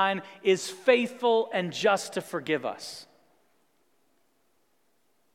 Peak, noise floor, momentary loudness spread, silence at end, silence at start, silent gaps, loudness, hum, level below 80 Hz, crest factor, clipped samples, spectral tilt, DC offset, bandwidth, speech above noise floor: -8 dBFS; -72 dBFS; 12 LU; 2.3 s; 0 s; none; -27 LUFS; none; -84 dBFS; 22 dB; under 0.1%; -4 dB/octave; under 0.1%; 15.5 kHz; 46 dB